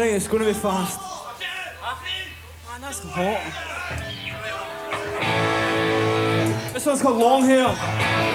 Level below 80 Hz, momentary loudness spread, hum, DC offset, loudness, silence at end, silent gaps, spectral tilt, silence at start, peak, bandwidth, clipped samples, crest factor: -48 dBFS; 13 LU; none; under 0.1%; -23 LUFS; 0 s; none; -4.5 dB/octave; 0 s; -6 dBFS; over 20 kHz; under 0.1%; 18 dB